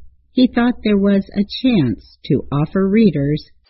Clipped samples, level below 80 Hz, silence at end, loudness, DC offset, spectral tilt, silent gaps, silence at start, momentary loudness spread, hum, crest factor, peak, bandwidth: under 0.1%; -42 dBFS; 0.25 s; -17 LUFS; under 0.1%; -11 dB/octave; none; 0 s; 8 LU; none; 16 dB; -2 dBFS; 5.8 kHz